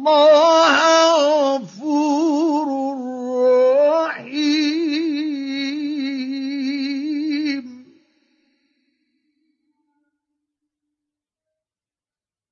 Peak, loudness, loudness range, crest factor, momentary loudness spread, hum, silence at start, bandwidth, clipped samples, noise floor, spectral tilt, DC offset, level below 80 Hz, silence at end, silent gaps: -4 dBFS; -18 LUFS; 12 LU; 16 dB; 12 LU; none; 0 s; 7.4 kHz; under 0.1%; under -90 dBFS; -2.5 dB/octave; under 0.1%; -82 dBFS; 4.7 s; none